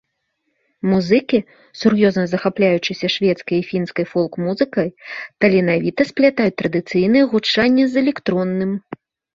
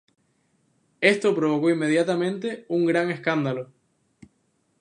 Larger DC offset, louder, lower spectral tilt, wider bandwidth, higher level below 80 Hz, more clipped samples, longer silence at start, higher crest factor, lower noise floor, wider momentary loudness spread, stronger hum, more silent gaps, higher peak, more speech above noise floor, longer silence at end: neither; first, -18 LUFS vs -23 LUFS; about the same, -6.5 dB/octave vs -6 dB/octave; second, 7.6 kHz vs 10.5 kHz; first, -56 dBFS vs -74 dBFS; neither; second, 0.85 s vs 1 s; about the same, 16 dB vs 20 dB; about the same, -71 dBFS vs -69 dBFS; about the same, 8 LU vs 9 LU; neither; neither; about the same, -2 dBFS vs -4 dBFS; first, 54 dB vs 47 dB; second, 0.4 s vs 1.15 s